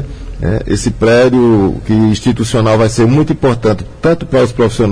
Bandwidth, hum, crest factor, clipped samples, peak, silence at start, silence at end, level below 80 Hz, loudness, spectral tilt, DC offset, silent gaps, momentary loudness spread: 10.5 kHz; none; 10 dB; under 0.1%; 0 dBFS; 0 s; 0 s; -28 dBFS; -11 LUFS; -6.5 dB/octave; under 0.1%; none; 7 LU